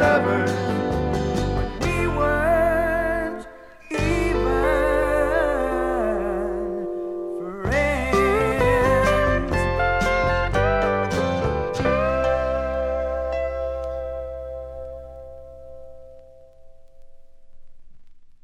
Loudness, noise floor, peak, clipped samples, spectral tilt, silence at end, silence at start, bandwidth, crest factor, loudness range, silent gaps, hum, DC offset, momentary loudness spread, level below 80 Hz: -22 LUFS; -45 dBFS; -6 dBFS; under 0.1%; -6.5 dB/octave; 0.1 s; 0 s; 15 kHz; 16 dB; 11 LU; none; none; under 0.1%; 14 LU; -32 dBFS